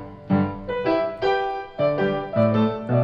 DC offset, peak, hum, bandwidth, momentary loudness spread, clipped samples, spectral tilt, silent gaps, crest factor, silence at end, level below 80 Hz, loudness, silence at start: under 0.1%; -8 dBFS; none; 7 kHz; 5 LU; under 0.1%; -9 dB/octave; none; 14 dB; 0 s; -50 dBFS; -23 LUFS; 0 s